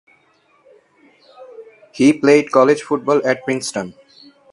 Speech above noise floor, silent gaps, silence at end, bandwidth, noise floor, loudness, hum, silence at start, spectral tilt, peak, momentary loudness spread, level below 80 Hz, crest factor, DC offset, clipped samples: 42 dB; none; 0.6 s; 11.5 kHz; -57 dBFS; -16 LUFS; none; 1.4 s; -5 dB/octave; 0 dBFS; 12 LU; -62 dBFS; 18 dB; under 0.1%; under 0.1%